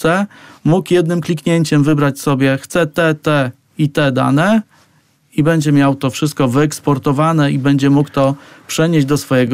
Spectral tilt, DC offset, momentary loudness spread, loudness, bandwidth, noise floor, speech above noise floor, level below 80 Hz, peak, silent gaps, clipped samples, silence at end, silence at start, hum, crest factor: -6.5 dB/octave; under 0.1%; 5 LU; -14 LUFS; 16 kHz; -54 dBFS; 41 dB; -48 dBFS; -4 dBFS; none; under 0.1%; 0 s; 0 s; none; 10 dB